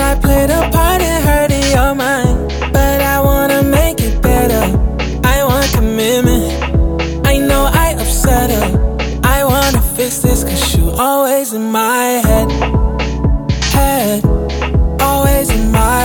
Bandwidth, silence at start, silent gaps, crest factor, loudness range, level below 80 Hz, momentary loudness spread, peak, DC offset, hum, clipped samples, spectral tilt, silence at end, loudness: over 20 kHz; 0 s; none; 12 dB; 1 LU; -16 dBFS; 4 LU; 0 dBFS; under 0.1%; none; under 0.1%; -5 dB/octave; 0 s; -13 LUFS